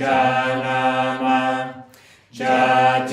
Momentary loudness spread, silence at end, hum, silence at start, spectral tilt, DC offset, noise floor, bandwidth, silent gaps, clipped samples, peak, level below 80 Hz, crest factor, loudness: 10 LU; 0 s; none; 0 s; -5 dB/octave; under 0.1%; -49 dBFS; 11.5 kHz; none; under 0.1%; -6 dBFS; -64 dBFS; 14 dB; -19 LUFS